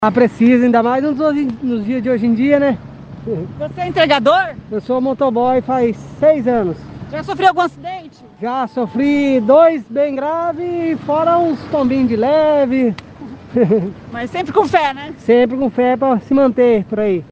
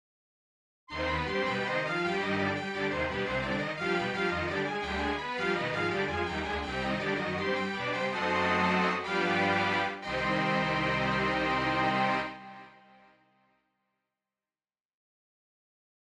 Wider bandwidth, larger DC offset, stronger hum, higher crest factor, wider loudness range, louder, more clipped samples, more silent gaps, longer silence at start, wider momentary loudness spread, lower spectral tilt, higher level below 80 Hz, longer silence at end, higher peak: second, 8 kHz vs 11 kHz; neither; neither; about the same, 14 dB vs 16 dB; about the same, 2 LU vs 4 LU; first, -15 LUFS vs -30 LUFS; neither; neither; second, 0 s vs 0.9 s; first, 13 LU vs 5 LU; first, -7 dB/octave vs -5.5 dB/octave; about the same, -48 dBFS vs -52 dBFS; second, 0.05 s vs 3.35 s; first, 0 dBFS vs -16 dBFS